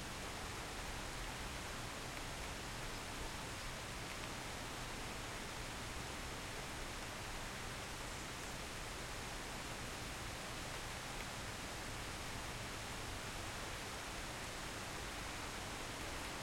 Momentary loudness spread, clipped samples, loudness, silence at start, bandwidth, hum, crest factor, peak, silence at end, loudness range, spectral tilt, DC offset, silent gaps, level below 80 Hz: 1 LU; under 0.1%; -46 LUFS; 0 s; 16.5 kHz; none; 14 dB; -32 dBFS; 0 s; 1 LU; -3 dB/octave; under 0.1%; none; -54 dBFS